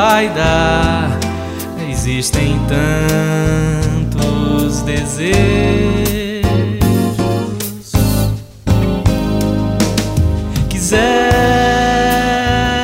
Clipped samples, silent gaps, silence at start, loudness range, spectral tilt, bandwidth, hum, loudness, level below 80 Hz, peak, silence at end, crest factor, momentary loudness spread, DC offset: under 0.1%; none; 0 s; 2 LU; -5.5 dB/octave; 16.5 kHz; none; -14 LUFS; -24 dBFS; 0 dBFS; 0 s; 14 dB; 6 LU; under 0.1%